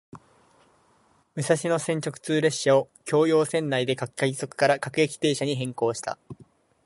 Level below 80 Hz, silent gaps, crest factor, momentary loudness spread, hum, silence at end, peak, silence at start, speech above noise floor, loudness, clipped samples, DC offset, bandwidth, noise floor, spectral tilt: -70 dBFS; none; 18 dB; 8 LU; none; 0.4 s; -6 dBFS; 0.15 s; 39 dB; -25 LUFS; under 0.1%; under 0.1%; 11.5 kHz; -63 dBFS; -4.5 dB/octave